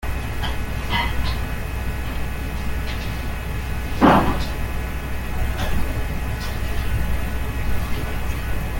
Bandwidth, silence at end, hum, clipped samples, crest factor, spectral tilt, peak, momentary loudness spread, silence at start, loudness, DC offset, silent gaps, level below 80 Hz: 17 kHz; 0 s; none; under 0.1%; 20 dB; -6 dB/octave; -2 dBFS; 9 LU; 0 s; -25 LUFS; under 0.1%; none; -26 dBFS